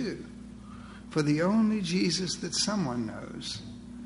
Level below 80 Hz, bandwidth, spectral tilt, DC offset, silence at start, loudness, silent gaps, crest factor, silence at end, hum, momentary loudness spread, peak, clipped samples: -54 dBFS; 11 kHz; -4.5 dB/octave; under 0.1%; 0 s; -29 LUFS; none; 16 dB; 0 s; 60 Hz at -45 dBFS; 20 LU; -14 dBFS; under 0.1%